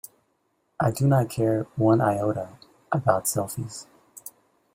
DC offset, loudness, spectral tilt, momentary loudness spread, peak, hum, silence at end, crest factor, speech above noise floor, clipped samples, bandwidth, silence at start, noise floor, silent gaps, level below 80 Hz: under 0.1%; -24 LUFS; -6.5 dB/octave; 20 LU; -6 dBFS; none; 0.45 s; 20 dB; 48 dB; under 0.1%; 16 kHz; 0.8 s; -71 dBFS; none; -58 dBFS